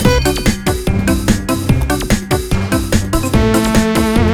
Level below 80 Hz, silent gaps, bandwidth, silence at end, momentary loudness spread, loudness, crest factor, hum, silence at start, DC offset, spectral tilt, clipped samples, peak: -20 dBFS; none; 16 kHz; 0 s; 4 LU; -15 LUFS; 14 dB; none; 0 s; under 0.1%; -5.5 dB/octave; under 0.1%; 0 dBFS